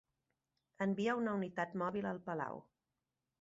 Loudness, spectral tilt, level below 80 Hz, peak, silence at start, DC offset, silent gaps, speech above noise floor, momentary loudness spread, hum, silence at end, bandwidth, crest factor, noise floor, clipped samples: -39 LUFS; -5.5 dB/octave; -78 dBFS; -22 dBFS; 0.8 s; under 0.1%; none; over 51 dB; 7 LU; none; 0.8 s; 7.6 kHz; 18 dB; under -90 dBFS; under 0.1%